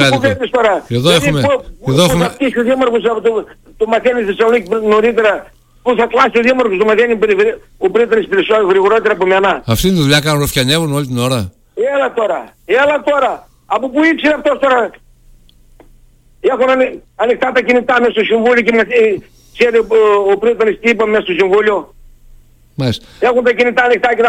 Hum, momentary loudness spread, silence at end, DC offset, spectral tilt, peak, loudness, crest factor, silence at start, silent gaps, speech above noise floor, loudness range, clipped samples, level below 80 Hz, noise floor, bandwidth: none; 7 LU; 0 s; under 0.1%; -5 dB/octave; 0 dBFS; -12 LUFS; 12 dB; 0 s; none; 33 dB; 3 LU; under 0.1%; -40 dBFS; -45 dBFS; 16.5 kHz